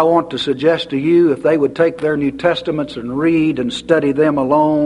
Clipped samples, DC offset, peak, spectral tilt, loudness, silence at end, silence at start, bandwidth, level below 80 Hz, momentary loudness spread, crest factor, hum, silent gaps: under 0.1%; under 0.1%; 0 dBFS; -6.5 dB/octave; -16 LUFS; 0 s; 0 s; 11 kHz; -50 dBFS; 7 LU; 14 dB; none; none